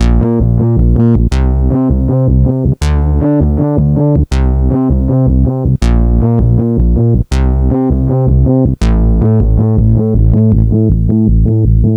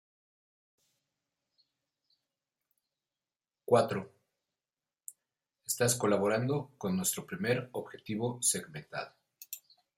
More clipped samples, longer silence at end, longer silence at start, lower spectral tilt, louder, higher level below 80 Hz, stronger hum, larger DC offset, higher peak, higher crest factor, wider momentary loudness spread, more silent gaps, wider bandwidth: first, 0.5% vs under 0.1%; second, 0 s vs 0.4 s; second, 0 s vs 3.7 s; first, -9.5 dB/octave vs -4 dB/octave; first, -11 LUFS vs -32 LUFS; first, -14 dBFS vs -76 dBFS; neither; first, 0.2% vs under 0.1%; first, 0 dBFS vs -12 dBFS; second, 8 dB vs 24 dB; second, 2 LU vs 21 LU; neither; second, 8.6 kHz vs 16 kHz